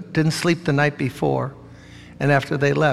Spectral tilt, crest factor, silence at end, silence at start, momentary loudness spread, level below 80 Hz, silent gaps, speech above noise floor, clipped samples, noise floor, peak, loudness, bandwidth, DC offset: -6 dB/octave; 18 dB; 0 s; 0 s; 6 LU; -54 dBFS; none; 23 dB; under 0.1%; -42 dBFS; -4 dBFS; -21 LUFS; 13.5 kHz; under 0.1%